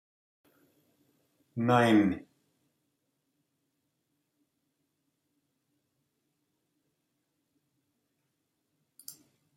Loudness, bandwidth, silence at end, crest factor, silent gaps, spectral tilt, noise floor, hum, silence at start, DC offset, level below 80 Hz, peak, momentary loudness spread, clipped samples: -26 LUFS; 16 kHz; 0.45 s; 24 dB; none; -6.5 dB/octave; -80 dBFS; none; 1.55 s; under 0.1%; -76 dBFS; -12 dBFS; 25 LU; under 0.1%